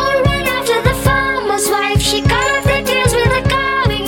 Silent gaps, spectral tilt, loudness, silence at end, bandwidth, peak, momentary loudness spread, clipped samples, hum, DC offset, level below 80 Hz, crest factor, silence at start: none; -4 dB/octave; -14 LUFS; 0 s; 19 kHz; -2 dBFS; 2 LU; under 0.1%; none; under 0.1%; -26 dBFS; 12 dB; 0 s